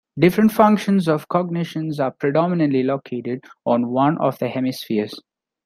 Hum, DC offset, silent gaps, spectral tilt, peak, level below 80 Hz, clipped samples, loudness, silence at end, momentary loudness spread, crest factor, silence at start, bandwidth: none; under 0.1%; none; -7.5 dB/octave; -2 dBFS; -60 dBFS; under 0.1%; -20 LUFS; 0.45 s; 12 LU; 18 dB; 0.15 s; 15.5 kHz